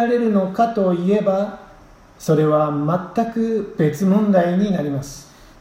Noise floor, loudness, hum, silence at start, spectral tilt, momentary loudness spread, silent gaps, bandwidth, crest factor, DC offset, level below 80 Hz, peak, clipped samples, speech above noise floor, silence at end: -46 dBFS; -19 LUFS; none; 0 s; -8 dB/octave; 12 LU; none; 16 kHz; 16 dB; under 0.1%; -52 dBFS; -4 dBFS; under 0.1%; 28 dB; 0.4 s